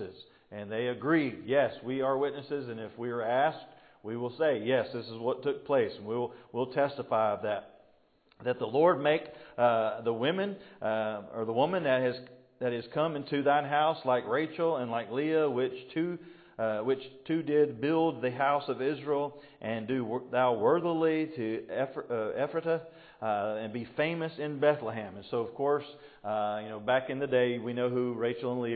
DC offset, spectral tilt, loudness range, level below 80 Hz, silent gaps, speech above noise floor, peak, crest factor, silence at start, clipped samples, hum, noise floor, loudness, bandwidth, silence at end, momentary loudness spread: under 0.1%; -10 dB/octave; 3 LU; -74 dBFS; none; 36 dB; -12 dBFS; 18 dB; 0 s; under 0.1%; none; -66 dBFS; -31 LUFS; 4.8 kHz; 0 s; 10 LU